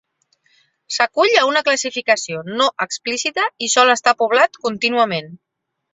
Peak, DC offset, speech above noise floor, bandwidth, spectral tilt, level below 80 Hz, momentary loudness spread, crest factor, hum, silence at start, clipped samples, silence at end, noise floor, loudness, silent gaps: -2 dBFS; under 0.1%; 46 dB; 8.2 kHz; -1.5 dB/octave; -68 dBFS; 8 LU; 18 dB; none; 0.9 s; under 0.1%; 0.6 s; -63 dBFS; -17 LUFS; none